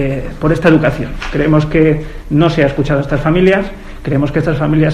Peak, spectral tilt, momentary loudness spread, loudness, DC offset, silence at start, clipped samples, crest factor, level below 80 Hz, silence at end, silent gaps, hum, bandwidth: 0 dBFS; -8 dB/octave; 9 LU; -13 LUFS; under 0.1%; 0 s; 0.1%; 12 dB; -26 dBFS; 0 s; none; none; 9.6 kHz